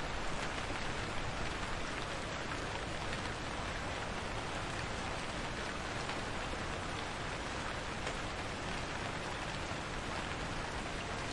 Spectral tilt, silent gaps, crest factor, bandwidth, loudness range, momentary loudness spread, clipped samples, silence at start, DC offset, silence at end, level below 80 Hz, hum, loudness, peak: -4 dB/octave; none; 18 dB; 11.5 kHz; 0 LU; 1 LU; under 0.1%; 0 s; under 0.1%; 0 s; -48 dBFS; none; -40 LUFS; -22 dBFS